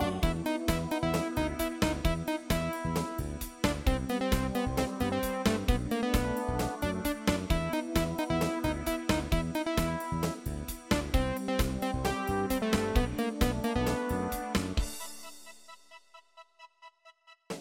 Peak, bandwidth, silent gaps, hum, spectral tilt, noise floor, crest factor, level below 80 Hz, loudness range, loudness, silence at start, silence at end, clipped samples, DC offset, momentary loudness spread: -12 dBFS; 17 kHz; none; none; -5.5 dB/octave; -59 dBFS; 18 dB; -38 dBFS; 3 LU; -31 LUFS; 0 s; 0 s; under 0.1%; under 0.1%; 5 LU